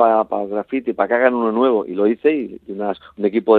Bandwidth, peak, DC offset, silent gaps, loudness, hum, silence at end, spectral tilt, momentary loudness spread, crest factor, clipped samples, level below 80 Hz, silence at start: 4.4 kHz; 0 dBFS; under 0.1%; none; -19 LUFS; none; 0 s; -9 dB/octave; 9 LU; 16 dB; under 0.1%; -62 dBFS; 0 s